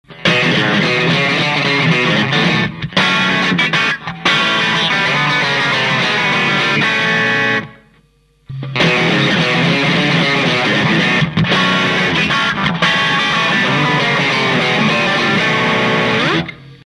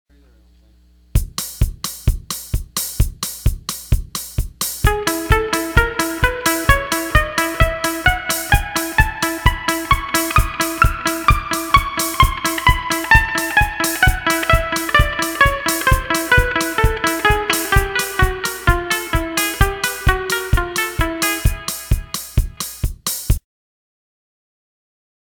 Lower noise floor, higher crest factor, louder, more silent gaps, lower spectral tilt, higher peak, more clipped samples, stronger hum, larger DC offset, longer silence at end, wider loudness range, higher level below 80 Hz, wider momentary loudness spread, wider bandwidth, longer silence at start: about the same, -53 dBFS vs -51 dBFS; about the same, 14 dB vs 18 dB; first, -13 LUFS vs -18 LUFS; neither; about the same, -4.5 dB/octave vs -3.5 dB/octave; about the same, 0 dBFS vs 0 dBFS; neither; neither; neither; second, 0.1 s vs 2 s; second, 2 LU vs 7 LU; second, -46 dBFS vs -24 dBFS; second, 2 LU vs 8 LU; second, 12 kHz vs 19.5 kHz; second, 0.1 s vs 1.15 s